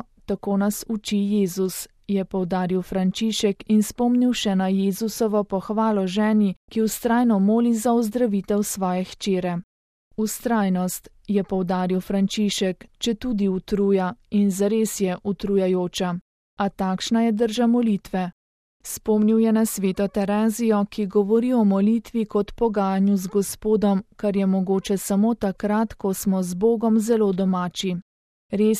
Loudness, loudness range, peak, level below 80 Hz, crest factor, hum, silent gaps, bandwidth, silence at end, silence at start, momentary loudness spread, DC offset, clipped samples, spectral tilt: -22 LUFS; 3 LU; -8 dBFS; -52 dBFS; 14 dB; none; 6.56-6.68 s, 9.64-10.11 s, 16.21-16.57 s, 18.32-18.80 s, 28.02-28.49 s; 15.5 kHz; 0 s; 0.3 s; 8 LU; under 0.1%; under 0.1%; -6 dB/octave